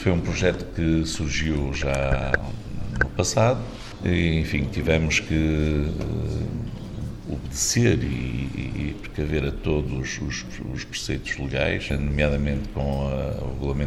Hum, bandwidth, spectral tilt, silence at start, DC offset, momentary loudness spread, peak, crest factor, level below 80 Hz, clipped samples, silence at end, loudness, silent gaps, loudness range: none; 13.5 kHz; -5 dB/octave; 0 s; under 0.1%; 10 LU; -2 dBFS; 22 dB; -32 dBFS; under 0.1%; 0 s; -25 LUFS; none; 4 LU